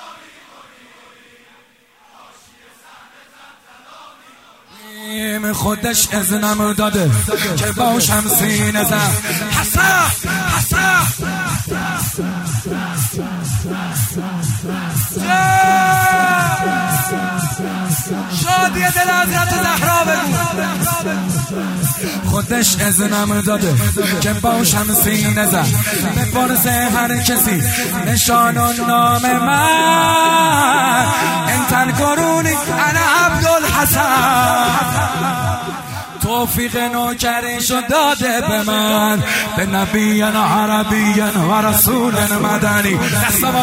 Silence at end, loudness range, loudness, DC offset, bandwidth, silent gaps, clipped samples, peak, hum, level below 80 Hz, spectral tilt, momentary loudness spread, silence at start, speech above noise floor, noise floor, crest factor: 0 s; 5 LU; -14 LUFS; under 0.1%; 16.5 kHz; none; under 0.1%; 0 dBFS; none; -38 dBFS; -3.5 dB/octave; 8 LU; 0 s; 36 dB; -50 dBFS; 16 dB